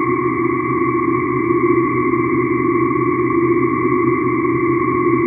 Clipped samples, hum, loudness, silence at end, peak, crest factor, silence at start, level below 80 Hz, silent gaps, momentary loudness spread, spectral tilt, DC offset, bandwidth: under 0.1%; none; -16 LUFS; 0 s; -2 dBFS; 14 dB; 0 s; -46 dBFS; none; 2 LU; -11.5 dB/octave; under 0.1%; 2.6 kHz